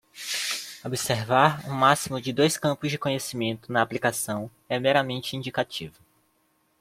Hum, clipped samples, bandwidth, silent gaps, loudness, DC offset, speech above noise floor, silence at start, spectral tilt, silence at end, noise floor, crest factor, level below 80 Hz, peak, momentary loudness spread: none; under 0.1%; 16.5 kHz; none; -25 LUFS; under 0.1%; 43 dB; 0.15 s; -4 dB/octave; 0.9 s; -68 dBFS; 22 dB; -62 dBFS; -4 dBFS; 10 LU